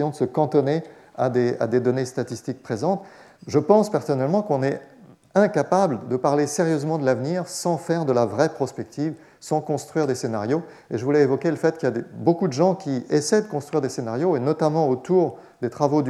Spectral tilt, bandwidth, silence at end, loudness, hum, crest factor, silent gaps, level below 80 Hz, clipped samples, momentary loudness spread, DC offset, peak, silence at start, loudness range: -6.5 dB/octave; 13.5 kHz; 0 s; -23 LUFS; none; 18 dB; none; -74 dBFS; under 0.1%; 9 LU; under 0.1%; -4 dBFS; 0 s; 3 LU